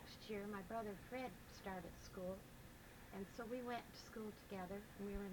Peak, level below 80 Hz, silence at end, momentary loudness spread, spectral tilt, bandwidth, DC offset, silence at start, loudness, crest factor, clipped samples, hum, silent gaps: -36 dBFS; -64 dBFS; 0 s; 7 LU; -5.5 dB/octave; 19 kHz; under 0.1%; 0 s; -52 LUFS; 16 dB; under 0.1%; none; none